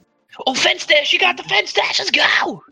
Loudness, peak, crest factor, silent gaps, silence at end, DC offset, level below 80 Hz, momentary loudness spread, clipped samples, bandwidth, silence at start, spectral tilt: -15 LUFS; 0 dBFS; 16 dB; none; 0.1 s; under 0.1%; -64 dBFS; 5 LU; under 0.1%; 15 kHz; 0.35 s; -0.5 dB/octave